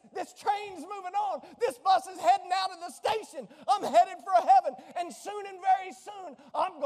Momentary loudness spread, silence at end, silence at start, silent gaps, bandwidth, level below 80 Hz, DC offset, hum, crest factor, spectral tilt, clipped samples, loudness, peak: 16 LU; 0 s; 0.15 s; none; 14.5 kHz; -80 dBFS; under 0.1%; none; 16 dB; -2 dB/octave; under 0.1%; -29 LUFS; -12 dBFS